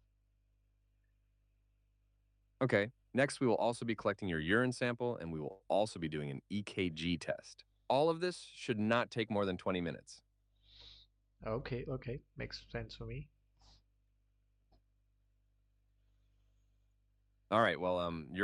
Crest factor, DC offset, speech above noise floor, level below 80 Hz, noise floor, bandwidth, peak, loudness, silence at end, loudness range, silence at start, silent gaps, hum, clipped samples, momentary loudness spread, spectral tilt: 22 dB; under 0.1%; 39 dB; -64 dBFS; -76 dBFS; 11 kHz; -16 dBFS; -37 LUFS; 0 s; 12 LU; 2.6 s; none; 50 Hz at -65 dBFS; under 0.1%; 14 LU; -5.5 dB/octave